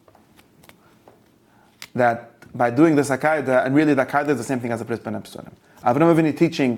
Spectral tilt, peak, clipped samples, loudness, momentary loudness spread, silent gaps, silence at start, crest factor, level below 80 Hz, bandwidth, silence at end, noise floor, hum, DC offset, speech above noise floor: -6.5 dB/octave; -4 dBFS; under 0.1%; -20 LUFS; 15 LU; none; 1.8 s; 18 dB; -62 dBFS; 16 kHz; 0 s; -56 dBFS; none; under 0.1%; 36 dB